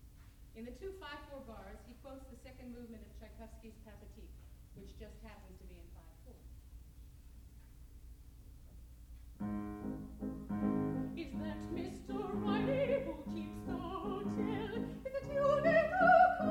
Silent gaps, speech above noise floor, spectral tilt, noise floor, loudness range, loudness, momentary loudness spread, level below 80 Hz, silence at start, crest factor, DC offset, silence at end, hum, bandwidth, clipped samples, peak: none; 8 dB; -7 dB/octave; -57 dBFS; 21 LU; -36 LUFS; 27 LU; -56 dBFS; 0 s; 24 dB; under 0.1%; 0 s; none; 19.5 kHz; under 0.1%; -16 dBFS